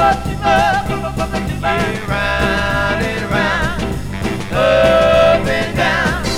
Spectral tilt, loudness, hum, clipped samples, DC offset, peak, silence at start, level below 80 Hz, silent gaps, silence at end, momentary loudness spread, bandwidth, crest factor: -5 dB/octave; -15 LUFS; none; under 0.1%; under 0.1%; 0 dBFS; 0 s; -28 dBFS; none; 0 s; 9 LU; 16.5 kHz; 14 dB